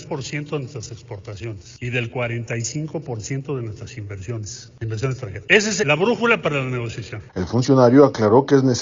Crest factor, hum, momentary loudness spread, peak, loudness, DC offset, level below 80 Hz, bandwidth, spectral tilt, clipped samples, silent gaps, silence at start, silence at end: 20 dB; none; 18 LU; 0 dBFS; -20 LUFS; under 0.1%; -54 dBFS; 7.6 kHz; -5.5 dB/octave; under 0.1%; none; 0 s; 0 s